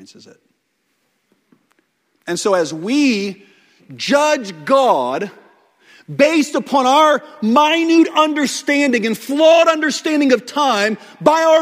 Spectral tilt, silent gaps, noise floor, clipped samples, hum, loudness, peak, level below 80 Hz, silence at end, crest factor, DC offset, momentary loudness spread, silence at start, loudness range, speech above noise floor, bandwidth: -3.5 dB/octave; none; -67 dBFS; under 0.1%; none; -15 LUFS; 0 dBFS; -66 dBFS; 0 s; 16 dB; under 0.1%; 9 LU; 2.25 s; 8 LU; 52 dB; 16 kHz